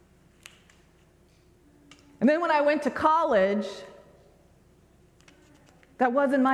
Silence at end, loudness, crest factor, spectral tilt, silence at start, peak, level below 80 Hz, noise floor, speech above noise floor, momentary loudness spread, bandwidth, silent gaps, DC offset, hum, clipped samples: 0 s; -24 LUFS; 20 dB; -6 dB/octave; 2.2 s; -8 dBFS; -64 dBFS; -60 dBFS; 36 dB; 13 LU; 12 kHz; none; under 0.1%; none; under 0.1%